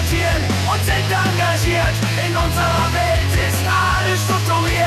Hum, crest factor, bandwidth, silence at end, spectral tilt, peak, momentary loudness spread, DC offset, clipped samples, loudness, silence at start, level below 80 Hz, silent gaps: none; 10 dB; 14.5 kHz; 0 s; -4.5 dB/octave; -6 dBFS; 2 LU; 0.1%; under 0.1%; -17 LUFS; 0 s; -28 dBFS; none